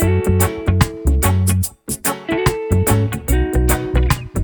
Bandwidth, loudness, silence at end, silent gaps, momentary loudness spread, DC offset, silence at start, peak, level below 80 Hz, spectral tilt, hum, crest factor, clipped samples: over 20 kHz; -17 LUFS; 0 s; none; 5 LU; under 0.1%; 0 s; 0 dBFS; -22 dBFS; -5.5 dB/octave; none; 16 dB; under 0.1%